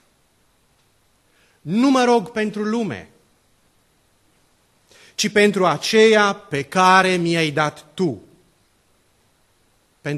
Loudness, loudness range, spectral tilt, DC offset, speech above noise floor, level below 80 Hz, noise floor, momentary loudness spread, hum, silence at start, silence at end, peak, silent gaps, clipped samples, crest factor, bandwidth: -18 LUFS; 7 LU; -4.5 dB/octave; under 0.1%; 44 dB; -64 dBFS; -61 dBFS; 15 LU; none; 1.65 s; 0 s; 0 dBFS; none; under 0.1%; 20 dB; 13 kHz